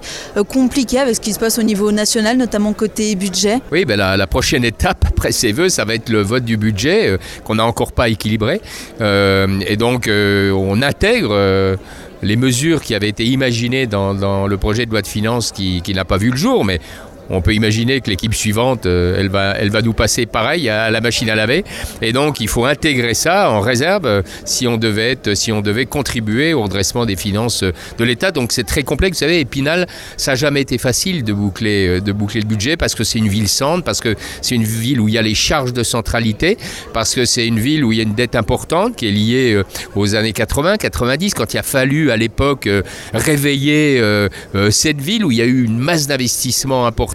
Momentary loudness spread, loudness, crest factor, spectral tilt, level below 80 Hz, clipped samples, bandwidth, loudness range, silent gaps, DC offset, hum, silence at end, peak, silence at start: 5 LU; -15 LUFS; 16 dB; -4.5 dB/octave; -32 dBFS; under 0.1%; 16.5 kHz; 2 LU; none; under 0.1%; none; 0 s; 0 dBFS; 0 s